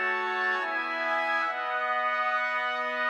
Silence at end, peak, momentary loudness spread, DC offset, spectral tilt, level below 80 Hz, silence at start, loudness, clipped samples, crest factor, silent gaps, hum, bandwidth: 0 s; -16 dBFS; 2 LU; under 0.1%; -1.5 dB/octave; -88 dBFS; 0 s; -27 LUFS; under 0.1%; 12 dB; none; none; 11.5 kHz